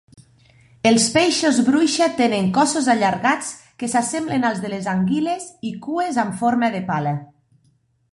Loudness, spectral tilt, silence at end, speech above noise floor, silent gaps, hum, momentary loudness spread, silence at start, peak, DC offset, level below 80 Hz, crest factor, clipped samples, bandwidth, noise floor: -19 LUFS; -4 dB/octave; 0.9 s; 43 dB; none; none; 10 LU; 0.85 s; -2 dBFS; under 0.1%; -60 dBFS; 18 dB; under 0.1%; 11.5 kHz; -62 dBFS